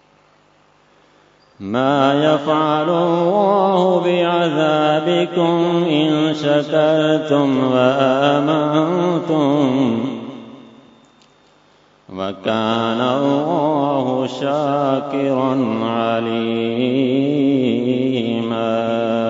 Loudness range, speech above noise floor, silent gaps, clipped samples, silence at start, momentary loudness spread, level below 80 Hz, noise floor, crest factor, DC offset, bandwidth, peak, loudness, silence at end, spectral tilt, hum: 6 LU; 38 dB; none; under 0.1%; 1.6 s; 5 LU; -66 dBFS; -54 dBFS; 16 dB; under 0.1%; 7.8 kHz; 0 dBFS; -17 LUFS; 0 s; -7 dB/octave; none